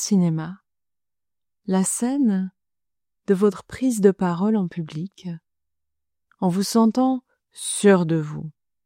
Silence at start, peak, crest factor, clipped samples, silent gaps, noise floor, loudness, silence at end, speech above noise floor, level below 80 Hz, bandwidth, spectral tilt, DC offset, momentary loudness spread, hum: 0 s; -4 dBFS; 20 dB; under 0.1%; none; under -90 dBFS; -22 LUFS; 0.35 s; over 69 dB; -64 dBFS; 16 kHz; -6 dB/octave; under 0.1%; 17 LU; none